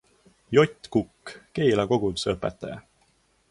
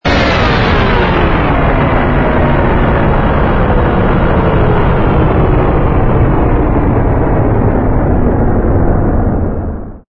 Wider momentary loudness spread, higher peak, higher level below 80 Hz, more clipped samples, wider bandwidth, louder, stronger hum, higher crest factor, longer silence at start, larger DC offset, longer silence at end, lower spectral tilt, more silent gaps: first, 17 LU vs 2 LU; second, -6 dBFS vs 0 dBFS; second, -52 dBFS vs -14 dBFS; neither; first, 11.5 kHz vs 6.8 kHz; second, -25 LUFS vs -11 LUFS; neither; first, 20 dB vs 10 dB; first, 0.5 s vs 0.05 s; neither; first, 0.7 s vs 0.1 s; second, -6 dB/octave vs -8.5 dB/octave; neither